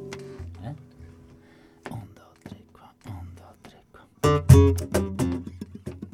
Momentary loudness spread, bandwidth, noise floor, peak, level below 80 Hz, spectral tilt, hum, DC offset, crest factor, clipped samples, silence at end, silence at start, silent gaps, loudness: 28 LU; 16 kHz; -54 dBFS; 0 dBFS; -38 dBFS; -7 dB/octave; none; under 0.1%; 24 dB; under 0.1%; 0.1 s; 0 s; none; -21 LUFS